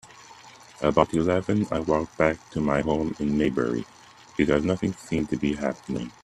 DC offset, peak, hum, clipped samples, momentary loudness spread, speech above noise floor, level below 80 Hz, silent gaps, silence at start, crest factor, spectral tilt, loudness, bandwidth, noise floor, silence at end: under 0.1%; -4 dBFS; none; under 0.1%; 7 LU; 24 dB; -48 dBFS; none; 0.05 s; 22 dB; -6.5 dB/octave; -25 LUFS; 12 kHz; -48 dBFS; 0.15 s